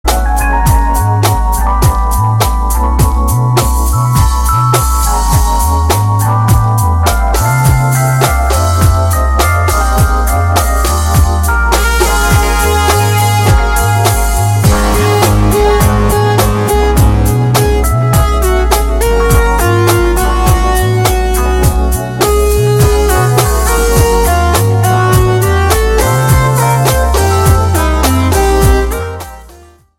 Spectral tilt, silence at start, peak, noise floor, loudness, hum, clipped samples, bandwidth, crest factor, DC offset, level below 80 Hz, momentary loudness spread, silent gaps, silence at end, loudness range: -5 dB/octave; 0.05 s; 0 dBFS; -38 dBFS; -10 LUFS; none; under 0.1%; 17 kHz; 10 dB; under 0.1%; -14 dBFS; 3 LU; none; 0.5 s; 1 LU